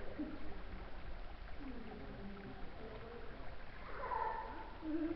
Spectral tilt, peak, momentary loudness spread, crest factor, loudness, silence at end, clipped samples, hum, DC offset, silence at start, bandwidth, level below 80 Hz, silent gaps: -5 dB/octave; -28 dBFS; 12 LU; 18 dB; -48 LUFS; 0 s; under 0.1%; none; under 0.1%; 0 s; 5.8 kHz; -52 dBFS; none